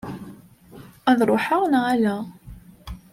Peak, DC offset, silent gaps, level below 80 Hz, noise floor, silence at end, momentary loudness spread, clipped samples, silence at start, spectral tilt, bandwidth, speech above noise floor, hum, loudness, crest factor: -6 dBFS; under 0.1%; none; -48 dBFS; -46 dBFS; 0.15 s; 22 LU; under 0.1%; 0.05 s; -6 dB/octave; 15.5 kHz; 26 dB; none; -21 LUFS; 18 dB